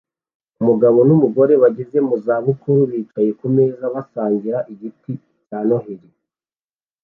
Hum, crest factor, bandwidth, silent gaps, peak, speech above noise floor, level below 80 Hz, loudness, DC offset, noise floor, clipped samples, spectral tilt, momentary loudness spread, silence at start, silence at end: none; 14 dB; 2.9 kHz; none; -2 dBFS; over 74 dB; -64 dBFS; -17 LUFS; under 0.1%; under -90 dBFS; under 0.1%; -13 dB/octave; 19 LU; 0.6 s; 1.05 s